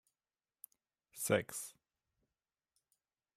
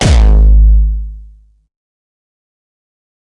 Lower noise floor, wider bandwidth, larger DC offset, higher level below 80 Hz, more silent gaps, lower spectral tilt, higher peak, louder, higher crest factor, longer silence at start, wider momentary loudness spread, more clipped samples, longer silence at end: first, under -90 dBFS vs -39 dBFS; first, 16 kHz vs 10.5 kHz; neither; second, -80 dBFS vs -10 dBFS; neither; second, -3.5 dB/octave vs -6 dB/octave; second, -20 dBFS vs 0 dBFS; second, -38 LUFS vs -10 LUFS; first, 26 dB vs 10 dB; first, 1.15 s vs 0 s; first, 24 LU vs 15 LU; neither; second, 1.65 s vs 2 s